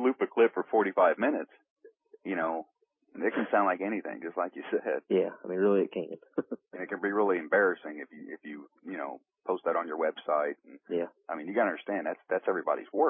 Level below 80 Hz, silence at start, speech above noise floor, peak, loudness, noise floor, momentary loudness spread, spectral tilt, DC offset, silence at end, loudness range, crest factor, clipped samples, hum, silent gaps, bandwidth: -86 dBFS; 0 s; 40 dB; -12 dBFS; -30 LUFS; -70 dBFS; 16 LU; -9.5 dB/octave; under 0.1%; 0 s; 3 LU; 18 dB; under 0.1%; none; 1.70-1.76 s; 3.7 kHz